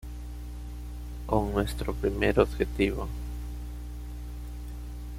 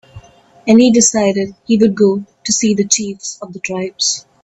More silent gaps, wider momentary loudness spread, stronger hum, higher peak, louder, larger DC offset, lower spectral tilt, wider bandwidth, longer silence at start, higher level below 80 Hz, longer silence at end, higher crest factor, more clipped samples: neither; about the same, 15 LU vs 14 LU; first, 60 Hz at -35 dBFS vs none; second, -8 dBFS vs 0 dBFS; second, -31 LUFS vs -13 LUFS; neither; first, -6.5 dB/octave vs -3.5 dB/octave; first, 16 kHz vs 8.4 kHz; second, 0 s vs 0.15 s; first, -36 dBFS vs -52 dBFS; second, 0 s vs 0.25 s; first, 24 dB vs 14 dB; neither